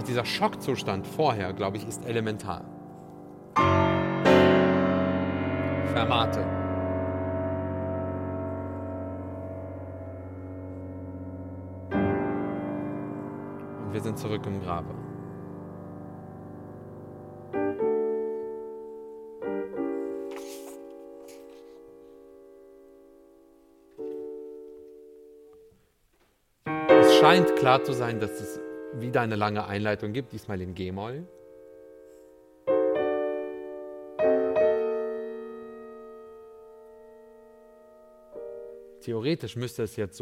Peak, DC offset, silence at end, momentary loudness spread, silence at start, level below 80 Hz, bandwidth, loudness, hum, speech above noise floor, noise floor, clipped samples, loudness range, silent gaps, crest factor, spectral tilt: -4 dBFS; under 0.1%; 0 s; 21 LU; 0 s; -58 dBFS; 16.5 kHz; -27 LUFS; none; 38 dB; -67 dBFS; under 0.1%; 22 LU; none; 24 dB; -6 dB/octave